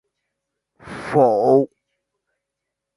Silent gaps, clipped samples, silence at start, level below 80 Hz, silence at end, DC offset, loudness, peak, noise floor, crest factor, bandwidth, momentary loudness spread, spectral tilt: none; under 0.1%; 0.85 s; -60 dBFS; 1.3 s; under 0.1%; -17 LUFS; -2 dBFS; -82 dBFS; 20 dB; 11.5 kHz; 18 LU; -8 dB/octave